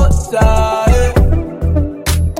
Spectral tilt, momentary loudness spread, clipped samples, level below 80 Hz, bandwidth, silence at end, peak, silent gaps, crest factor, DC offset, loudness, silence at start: -6 dB/octave; 5 LU; under 0.1%; -14 dBFS; 16.5 kHz; 0 s; -2 dBFS; none; 10 dB; 0.3%; -14 LUFS; 0 s